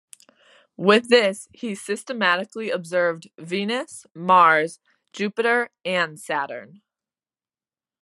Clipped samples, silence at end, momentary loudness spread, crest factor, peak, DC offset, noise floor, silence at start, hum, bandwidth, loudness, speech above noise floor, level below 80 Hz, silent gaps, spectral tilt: under 0.1%; 1.35 s; 16 LU; 22 dB; -2 dBFS; under 0.1%; under -90 dBFS; 0.8 s; none; 12.5 kHz; -21 LUFS; over 68 dB; -78 dBFS; none; -4 dB/octave